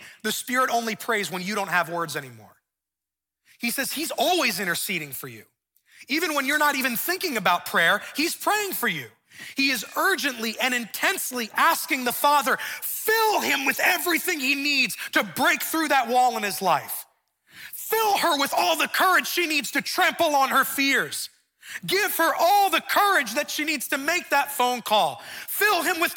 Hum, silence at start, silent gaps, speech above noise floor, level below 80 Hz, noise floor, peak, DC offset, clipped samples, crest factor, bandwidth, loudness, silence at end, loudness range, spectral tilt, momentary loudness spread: none; 0 s; none; 65 dB; -74 dBFS; -88 dBFS; -6 dBFS; under 0.1%; under 0.1%; 18 dB; 17.5 kHz; -23 LUFS; 0 s; 5 LU; -1.5 dB/octave; 8 LU